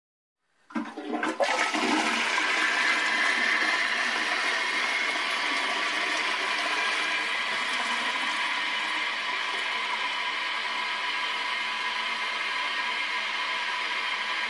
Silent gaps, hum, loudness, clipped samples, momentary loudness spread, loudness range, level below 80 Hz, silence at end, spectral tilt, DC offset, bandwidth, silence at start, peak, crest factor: none; none; -26 LUFS; under 0.1%; 5 LU; 4 LU; -82 dBFS; 0 s; 0 dB/octave; under 0.1%; 11.5 kHz; 0.7 s; -12 dBFS; 18 dB